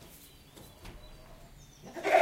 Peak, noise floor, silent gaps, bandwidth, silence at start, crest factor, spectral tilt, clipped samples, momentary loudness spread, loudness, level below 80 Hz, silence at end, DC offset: -12 dBFS; -54 dBFS; none; 16 kHz; 0.85 s; 22 dB; -4 dB/octave; under 0.1%; 18 LU; -32 LUFS; -56 dBFS; 0 s; under 0.1%